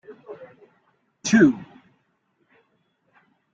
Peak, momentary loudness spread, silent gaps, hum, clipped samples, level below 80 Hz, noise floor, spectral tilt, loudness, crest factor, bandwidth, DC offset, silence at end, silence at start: -4 dBFS; 26 LU; none; none; under 0.1%; -64 dBFS; -69 dBFS; -5 dB/octave; -20 LUFS; 22 dB; 8.8 kHz; under 0.1%; 1.9 s; 0.1 s